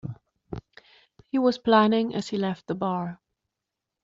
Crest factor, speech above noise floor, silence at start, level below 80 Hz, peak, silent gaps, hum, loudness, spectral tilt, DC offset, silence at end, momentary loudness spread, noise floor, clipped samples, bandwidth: 20 dB; 62 dB; 0.05 s; -60 dBFS; -6 dBFS; none; none; -25 LUFS; -5 dB/octave; under 0.1%; 0.9 s; 21 LU; -86 dBFS; under 0.1%; 7.8 kHz